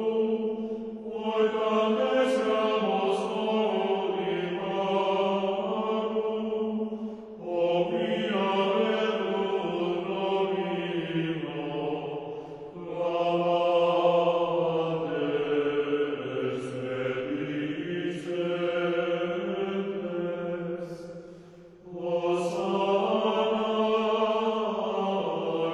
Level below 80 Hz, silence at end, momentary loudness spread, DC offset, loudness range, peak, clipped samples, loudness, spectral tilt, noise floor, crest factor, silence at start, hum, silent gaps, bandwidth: -68 dBFS; 0 s; 9 LU; under 0.1%; 4 LU; -12 dBFS; under 0.1%; -28 LUFS; -6.5 dB/octave; -49 dBFS; 16 dB; 0 s; none; none; 11 kHz